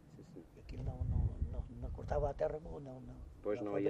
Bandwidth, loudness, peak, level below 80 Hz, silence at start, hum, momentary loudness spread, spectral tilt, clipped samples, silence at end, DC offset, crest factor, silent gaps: 8 kHz; -41 LUFS; -22 dBFS; -46 dBFS; 0.05 s; none; 17 LU; -9 dB/octave; under 0.1%; 0 s; under 0.1%; 18 dB; none